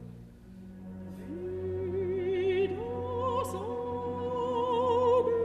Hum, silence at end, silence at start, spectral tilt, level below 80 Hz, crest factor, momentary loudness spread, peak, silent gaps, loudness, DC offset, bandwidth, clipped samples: none; 0 s; 0 s; -7 dB/octave; -58 dBFS; 14 dB; 20 LU; -16 dBFS; none; -31 LUFS; under 0.1%; 13 kHz; under 0.1%